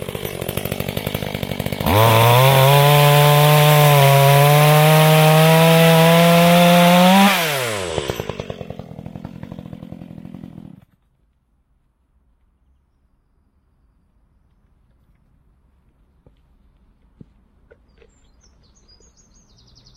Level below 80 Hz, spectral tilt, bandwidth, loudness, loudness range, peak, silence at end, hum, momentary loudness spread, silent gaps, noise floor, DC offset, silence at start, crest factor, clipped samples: -46 dBFS; -5.5 dB/octave; 16.5 kHz; -13 LUFS; 18 LU; 0 dBFS; 9.5 s; none; 24 LU; none; -62 dBFS; under 0.1%; 0 s; 16 dB; under 0.1%